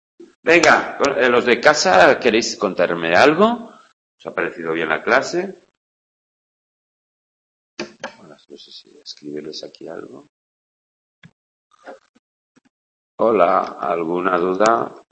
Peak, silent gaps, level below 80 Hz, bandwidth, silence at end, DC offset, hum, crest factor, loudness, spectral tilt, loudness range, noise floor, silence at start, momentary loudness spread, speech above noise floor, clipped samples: 0 dBFS; 0.36-0.43 s, 3.93-4.18 s, 5.77-7.77 s, 10.29-11.22 s, 11.33-11.70 s, 12.09-12.55 s, 12.70-13.18 s; -60 dBFS; 9.6 kHz; 0.15 s; under 0.1%; none; 20 dB; -16 LUFS; -3.5 dB/octave; 22 LU; -37 dBFS; 0.2 s; 22 LU; 19 dB; under 0.1%